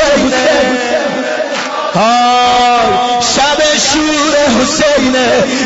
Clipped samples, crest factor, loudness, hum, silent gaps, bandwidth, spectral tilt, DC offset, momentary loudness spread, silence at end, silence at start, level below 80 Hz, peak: under 0.1%; 10 dB; -10 LUFS; none; none; 8 kHz; -2.5 dB/octave; under 0.1%; 6 LU; 0 s; 0 s; -38 dBFS; 0 dBFS